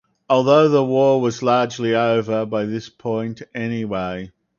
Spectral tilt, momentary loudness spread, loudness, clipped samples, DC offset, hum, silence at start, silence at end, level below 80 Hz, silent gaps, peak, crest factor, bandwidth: -6.5 dB/octave; 13 LU; -19 LUFS; under 0.1%; under 0.1%; none; 0.3 s; 0.3 s; -56 dBFS; none; -2 dBFS; 18 dB; 7.2 kHz